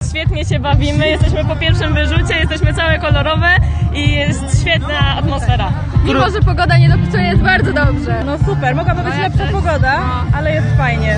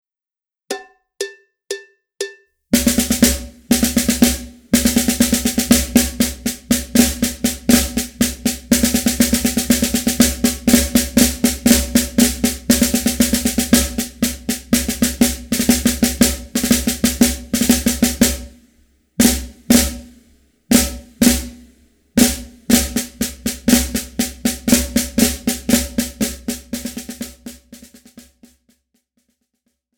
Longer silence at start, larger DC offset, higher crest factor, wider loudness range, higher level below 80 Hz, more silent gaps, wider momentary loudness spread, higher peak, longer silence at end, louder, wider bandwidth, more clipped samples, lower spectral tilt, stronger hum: second, 0 s vs 0.7 s; neither; second, 12 dB vs 18 dB; second, 1 LU vs 5 LU; first, -20 dBFS vs -32 dBFS; neither; second, 5 LU vs 14 LU; about the same, 0 dBFS vs 0 dBFS; second, 0 s vs 1.8 s; about the same, -14 LUFS vs -16 LUFS; second, 10 kHz vs over 20 kHz; neither; first, -6 dB/octave vs -3 dB/octave; neither